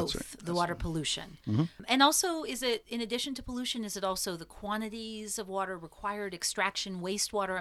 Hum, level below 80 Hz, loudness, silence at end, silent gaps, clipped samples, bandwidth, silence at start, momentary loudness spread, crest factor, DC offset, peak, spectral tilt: none; -54 dBFS; -32 LUFS; 0 s; none; under 0.1%; 16.5 kHz; 0 s; 10 LU; 24 dB; under 0.1%; -10 dBFS; -3 dB/octave